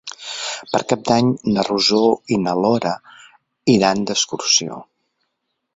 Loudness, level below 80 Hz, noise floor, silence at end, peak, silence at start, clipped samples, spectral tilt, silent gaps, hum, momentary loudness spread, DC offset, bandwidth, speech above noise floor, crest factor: -18 LUFS; -56 dBFS; -75 dBFS; 0.95 s; -2 dBFS; 0.05 s; under 0.1%; -4 dB/octave; none; none; 11 LU; under 0.1%; 8 kHz; 57 dB; 18 dB